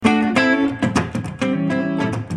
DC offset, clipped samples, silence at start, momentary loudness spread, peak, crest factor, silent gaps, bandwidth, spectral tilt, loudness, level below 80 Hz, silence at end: under 0.1%; under 0.1%; 0 s; 7 LU; -2 dBFS; 18 dB; none; 11.5 kHz; -6 dB/octave; -19 LUFS; -50 dBFS; 0 s